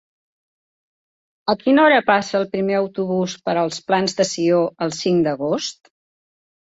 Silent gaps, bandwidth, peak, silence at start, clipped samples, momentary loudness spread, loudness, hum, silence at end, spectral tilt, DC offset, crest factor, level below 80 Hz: none; 8 kHz; -2 dBFS; 1.45 s; under 0.1%; 9 LU; -19 LUFS; none; 1.05 s; -4.5 dB/octave; under 0.1%; 18 dB; -62 dBFS